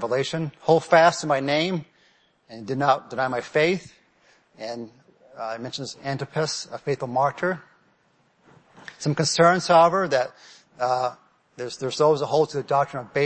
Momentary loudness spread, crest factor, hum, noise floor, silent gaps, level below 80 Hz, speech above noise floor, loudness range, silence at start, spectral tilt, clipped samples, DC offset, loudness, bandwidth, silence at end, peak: 17 LU; 20 dB; none; -64 dBFS; none; -68 dBFS; 41 dB; 7 LU; 0 s; -4.5 dB/octave; under 0.1%; under 0.1%; -23 LUFS; 8.8 kHz; 0 s; -4 dBFS